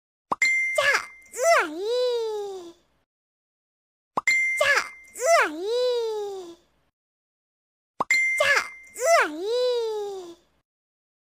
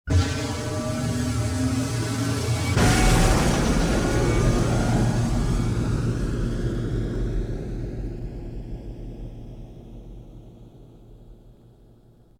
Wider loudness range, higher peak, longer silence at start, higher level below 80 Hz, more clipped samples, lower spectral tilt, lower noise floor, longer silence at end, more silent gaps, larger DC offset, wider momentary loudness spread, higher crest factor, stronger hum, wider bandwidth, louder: second, 3 LU vs 19 LU; about the same, -6 dBFS vs -8 dBFS; first, 0.3 s vs 0.05 s; second, -70 dBFS vs -30 dBFS; neither; second, -0.5 dB/octave vs -5.5 dB/octave; second, -47 dBFS vs -53 dBFS; first, 1.05 s vs 0.9 s; first, 3.06-4.11 s, 6.93-7.94 s vs none; neither; second, 15 LU vs 20 LU; about the same, 20 dB vs 16 dB; neither; about the same, 16 kHz vs 15.5 kHz; about the same, -23 LUFS vs -24 LUFS